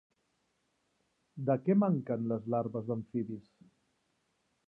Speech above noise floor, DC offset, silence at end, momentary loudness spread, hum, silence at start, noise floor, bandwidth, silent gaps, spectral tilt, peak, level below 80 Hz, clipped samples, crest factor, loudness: 46 dB; under 0.1%; 1.25 s; 13 LU; none; 1.35 s; -78 dBFS; 2.9 kHz; none; -12 dB/octave; -16 dBFS; -76 dBFS; under 0.1%; 18 dB; -33 LUFS